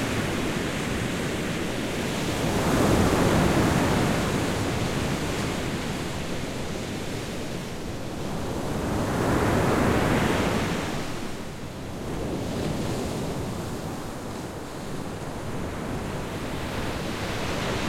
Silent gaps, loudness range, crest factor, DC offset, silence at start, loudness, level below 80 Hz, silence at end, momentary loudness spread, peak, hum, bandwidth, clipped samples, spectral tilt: none; 9 LU; 18 dB; under 0.1%; 0 s; -27 LUFS; -40 dBFS; 0 s; 12 LU; -8 dBFS; none; 16.5 kHz; under 0.1%; -5 dB/octave